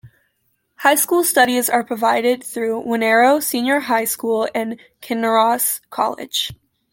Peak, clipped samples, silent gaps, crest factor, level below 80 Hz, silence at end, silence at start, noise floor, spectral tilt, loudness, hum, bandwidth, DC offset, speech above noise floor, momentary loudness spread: -2 dBFS; under 0.1%; none; 16 dB; -62 dBFS; 0.4 s; 0.05 s; -68 dBFS; -2 dB/octave; -17 LUFS; none; 17 kHz; under 0.1%; 50 dB; 9 LU